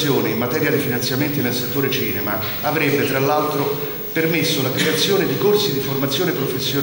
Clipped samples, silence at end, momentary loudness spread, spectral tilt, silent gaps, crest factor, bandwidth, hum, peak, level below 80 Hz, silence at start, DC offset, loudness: under 0.1%; 0 s; 4 LU; -4.5 dB/octave; none; 14 dB; 17.5 kHz; none; -4 dBFS; -52 dBFS; 0 s; under 0.1%; -18 LUFS